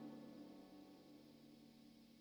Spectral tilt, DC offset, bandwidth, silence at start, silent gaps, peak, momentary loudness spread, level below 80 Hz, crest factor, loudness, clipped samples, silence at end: -6 dB/octave; under 0.1%; over 20 kHz; 0 s; none; -46 dBFS; 8 LU; -88 dBFS; 16 dB; -62 LUFS; under 0.1%; 0 s